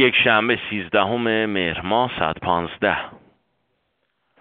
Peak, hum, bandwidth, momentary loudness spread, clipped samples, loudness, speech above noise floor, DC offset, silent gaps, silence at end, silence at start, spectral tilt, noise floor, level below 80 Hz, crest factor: 0 dBFS; none; 4.7 kHz; 7 LU; under 0.1%; -20 LUFS; 51 dB; under 0.1%; none; 1.25 s; 0 s; -2 dB/octave; -71 dBFS; -52 dBFS; 20 dB